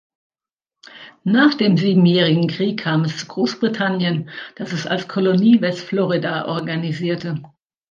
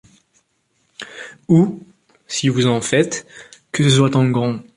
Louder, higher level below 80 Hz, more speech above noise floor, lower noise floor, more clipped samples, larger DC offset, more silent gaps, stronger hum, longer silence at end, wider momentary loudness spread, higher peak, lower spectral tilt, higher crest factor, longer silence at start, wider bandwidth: about the same, -18 LUFS vs -17 LUFS; second, -64 dBFS vs -56 dBFS; first, 70 dB vs 49 dB; first, -87 dBFS vs -65 dBFS; neither; neither; neither; neither; first, 0.45 s vs 0.15 s; second, 12 LU vs 20 LU; about the same, -2 dBFS vs -2 dBFS; about the same, -6.5 dB/octave vs -5.5 dB/octave; about the same, 16 dB vs 16 dB; about the same, 0.95 s vs 1 s; second, 7.4 kHz vs 11.5 kHz